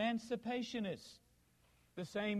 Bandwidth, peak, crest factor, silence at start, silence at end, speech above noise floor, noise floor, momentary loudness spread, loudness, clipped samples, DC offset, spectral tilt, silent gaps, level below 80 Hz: 13 kHz; -26 dBFS; 16 dB; 0 s; 0 s; 31 dB; -72 dBFS; 13 LU; -42 LUFS; under 0.1%; under 0.1%; -5.5 dB/octave; none; -74 dBFS